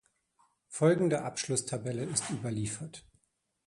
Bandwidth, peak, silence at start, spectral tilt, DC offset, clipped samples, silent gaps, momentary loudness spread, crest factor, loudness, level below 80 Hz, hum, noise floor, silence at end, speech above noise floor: 11.5 kHz; -12 dBFS; 0.7 s; -5 dB/octave; under 0.1%; under 0.1%; none; 16 LU; 20 dB; -32 LUFS; -66 dBFS; none; -78 dBFS; 0.65 s; 46 dB